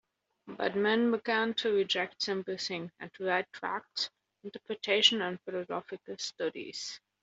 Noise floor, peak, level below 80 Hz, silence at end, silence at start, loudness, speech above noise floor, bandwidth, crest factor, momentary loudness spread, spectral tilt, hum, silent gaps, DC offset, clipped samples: -52 dBFS; -10 dBFS; -80 dBFS; 0.25 s; 0.45 s; -32 LUFS; 19 dB; 8 kHz; 24 dB; 15 LU; -3 dB/octave; none; none; under 0.1%; under 0.1%